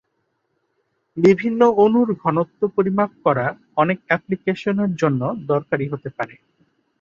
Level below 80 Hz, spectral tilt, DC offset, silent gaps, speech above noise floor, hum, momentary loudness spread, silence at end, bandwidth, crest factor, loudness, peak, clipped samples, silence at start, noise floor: -62 dBFS; -8 dB/octave; under 0.1%; none; 52 dB; none; 10 LU; 0.75 s; 7.4 kHz; 18 dB; -20 LUFS; -2 dBFS; under 0.1%; 1.15 s; -71 dBFS